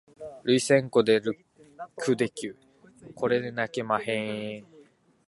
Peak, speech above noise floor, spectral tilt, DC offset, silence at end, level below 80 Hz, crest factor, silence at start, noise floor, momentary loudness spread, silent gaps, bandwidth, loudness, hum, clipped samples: -6 dBFS; 32 dB; -5 dB/octave; under 0.1%; 0.65 s; -70 dBFS; 22 dB; 0.2 s; -58 dBFS; 19 LU; none; 11.5 kHz; -27 LUFS; none; under 0.1%